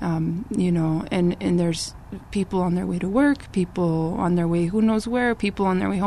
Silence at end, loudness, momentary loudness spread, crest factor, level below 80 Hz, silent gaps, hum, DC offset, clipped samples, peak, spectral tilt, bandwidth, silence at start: 0 s; -23 LUFS; 5 LU; 14 dB; -44 dBFS; none; none; 0.3%; under 0.1%; -8 dBFS; -7 dB/octave; 12 kHz; 0 s